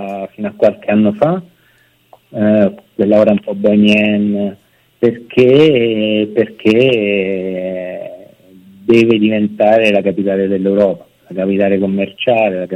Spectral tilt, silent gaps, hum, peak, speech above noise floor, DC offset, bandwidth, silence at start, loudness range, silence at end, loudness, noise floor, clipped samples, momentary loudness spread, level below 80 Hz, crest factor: -7.5 dB/octave; none; none; 0 dBFS; 41 dB; under 0.1%; 8.6 kHz; 0 s; 2 LU; 0 s; -13 LUFS; -53 dBFS; under 0.1%; 13 LU; -56 dBFS; 14 dB